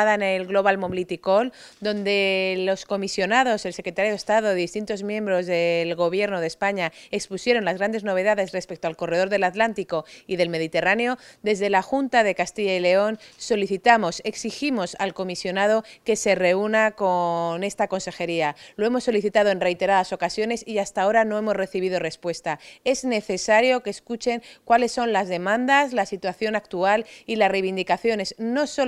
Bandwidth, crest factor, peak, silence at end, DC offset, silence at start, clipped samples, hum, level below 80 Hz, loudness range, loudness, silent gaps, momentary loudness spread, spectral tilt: 13.5 kHz; 20 dB; -2 dBFS; 0 s; under 0.1%; 0 s; under 0.1%; none; -60 dBFS; 2 LU; -23 LUFS; none; 8 LU; -4 dB/octave